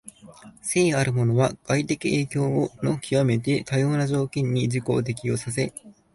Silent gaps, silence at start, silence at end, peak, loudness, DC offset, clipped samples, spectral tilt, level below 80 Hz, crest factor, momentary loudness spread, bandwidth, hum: none; 0.05 s; 0.25 s; -8 dBFS; -24 LUFS; under 0.1%; under 0.1%; -6 dB/octave; -54 dBFS; 16 dB; 6 LU; 11.5 kHz; none